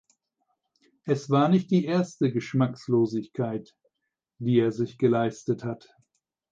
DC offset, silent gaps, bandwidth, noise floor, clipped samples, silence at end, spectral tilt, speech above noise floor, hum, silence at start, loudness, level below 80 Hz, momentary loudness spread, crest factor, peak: under 0.1%; none; 7.8 kHz; -84 dBFS; under 0.1%; 0.75 s; -8 dB/octave; 59 dB; none; 1.05 s; -26 LUFS; -70 dBFS; 11 LU; 18 dB; -10 dBFS